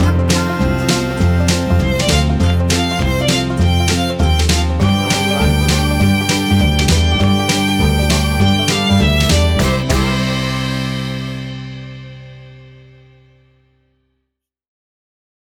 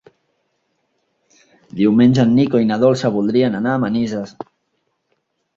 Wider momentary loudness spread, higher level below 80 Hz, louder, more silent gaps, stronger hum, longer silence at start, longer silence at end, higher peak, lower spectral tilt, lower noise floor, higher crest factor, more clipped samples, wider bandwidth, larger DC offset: second, 8 LU vs 20 LU; first, -22 dBFS vs -56 dBFS; about the same, -14 LUFS vs -16 LUFS; neither; neither; second, 0 s vs 1.75 s; first, 2.9 s vs 1.3 s; about the same, -2 dBFS vs -2 dBFS; second, -5 dB/octave vs -7.5 dB/octave; first, -75 dBFS vs -69 dBFS; about the same, 12 dB vs 16 dB; neither; first, 18.5 kHz vs 7.6 kHz; neither